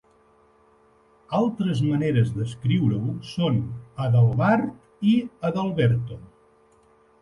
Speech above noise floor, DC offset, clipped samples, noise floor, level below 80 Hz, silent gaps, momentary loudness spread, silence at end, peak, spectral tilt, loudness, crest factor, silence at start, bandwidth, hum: 36 dB; under 0.1%; under 0.1%; -59 dBFS; -54 dBFS; none; 10 LU; 1 s; -8 dBFS; -8.5 dB/octave; -23 LUFS; 16 dB; 1.3 s; 11 kHz; none